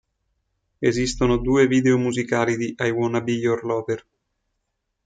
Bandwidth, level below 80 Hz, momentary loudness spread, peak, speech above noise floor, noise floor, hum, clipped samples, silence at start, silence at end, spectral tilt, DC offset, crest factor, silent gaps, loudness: 9.4 kHz; -42 dBFS; 7 LU; -6 dBFS; 56 dB; -77 dBFS; none; under 0.1%; 0.8 s; 1.05 s; -6 dB/octave; under 0.1%; 16 dB; none; -21 LUFS